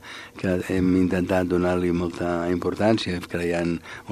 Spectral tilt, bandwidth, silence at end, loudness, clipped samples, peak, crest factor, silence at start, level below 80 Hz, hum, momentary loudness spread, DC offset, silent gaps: -6.5 dB/octave; 14.5 kHz; 0 s; -24 LUFS; under 0.1%; -4 dBFS; 18 dB; 0 s; -48 dBFS; none; 6 LU; under 0.1%; none